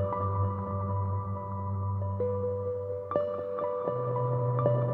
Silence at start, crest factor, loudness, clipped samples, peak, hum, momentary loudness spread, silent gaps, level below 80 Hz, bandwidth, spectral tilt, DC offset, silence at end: 0 s; 18 dB; -31 LUFS; under 0.1%; -12 dBFS; none; 6 LU; none; -60 dBFS; 3.4 kHz; -11.5 dB/octave; under 0.1%; 0 s